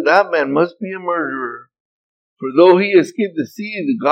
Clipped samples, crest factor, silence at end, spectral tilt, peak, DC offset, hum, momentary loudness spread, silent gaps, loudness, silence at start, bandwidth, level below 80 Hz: under 0.1%; 16 dB; 0 s; -6.5 dB/octave; 0 dBFS; under 0.1%; none; 14 LU; 1.80-2.37 s; -16 LUFS; 0 s; 8.8 kHz; -82 dBFS